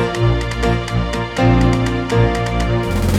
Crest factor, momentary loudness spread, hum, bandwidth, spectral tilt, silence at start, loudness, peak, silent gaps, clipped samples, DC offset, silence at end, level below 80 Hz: 14 dB; 5 LU; none; 14.5 kHz; -6.5 dB/octave; 0 s; -17 LUFS; -2 dBFS; none; under 0.1%; under 0.1%; 0 s; -24 dBFS